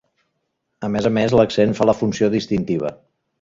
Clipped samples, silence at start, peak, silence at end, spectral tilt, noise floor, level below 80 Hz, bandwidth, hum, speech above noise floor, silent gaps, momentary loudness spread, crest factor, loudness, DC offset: under 0.1%; 0.8 s; -2 dBFS; 0.45 s; -6.5 dB/octave; -73 dBFS; -48 dBFS; 7.6 kHz; none; 56 dB; none; 9 LU; 18 dB; -19 LUFS; under 0.1%